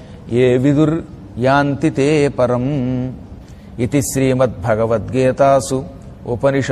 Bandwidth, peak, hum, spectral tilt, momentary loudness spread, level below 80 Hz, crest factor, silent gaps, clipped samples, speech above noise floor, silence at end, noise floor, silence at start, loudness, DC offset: 14 kHz; -2 dBFS; none; -6.5 dB/octave; 13 LU; -40 dBFS; 14 dB; none; under 0.1%; 20 dB; 0 s; -35 dBFS; 0 s; -16 LUFS; under 0.1%